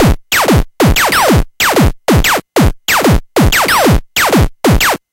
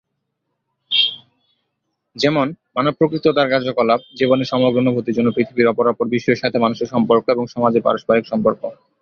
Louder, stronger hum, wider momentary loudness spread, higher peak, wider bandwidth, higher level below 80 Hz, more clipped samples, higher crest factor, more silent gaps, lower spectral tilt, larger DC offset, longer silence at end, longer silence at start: first, -10 LUFS vs -17 LUFS; neither; about the same, 3 LU vs 4 LU; about the same, 0 dBFS vs -2 dBFS; first, 17.5 kHz vs 7.2 kHz; first, -18 dBFS vs -58 dBFS; neither; second, 10 dB vs 16 dB; neither; second, -4.5 dB/octave vs -6.5 dB/octave; neither; second, 0.15 s vs 0.3 s; second, 0 s vs 0.9 s